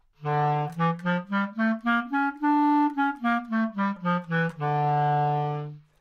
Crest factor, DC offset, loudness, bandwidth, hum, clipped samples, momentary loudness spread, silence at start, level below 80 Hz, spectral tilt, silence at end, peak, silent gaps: 12 dB; under 0.1%; -26 LUFS; 6.8 kHz; none; under 0.1%; 5 LU; 0.2 s; -66 dBFS; -8.5 dB/octave; 0.2 s; -14 dBFS; none